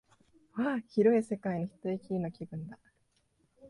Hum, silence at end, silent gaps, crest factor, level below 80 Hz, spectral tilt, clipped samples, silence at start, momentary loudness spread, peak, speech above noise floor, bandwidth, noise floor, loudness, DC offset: none; 0 s; none; 20 dB; -70 dBFS; -8.5 dB/octave; under 0.1%; 0.55 s; 17 LU; -14 dBFS; 42 dB; 11.5 kHz; -74 dBFS; -32 LUFS; under 0.1%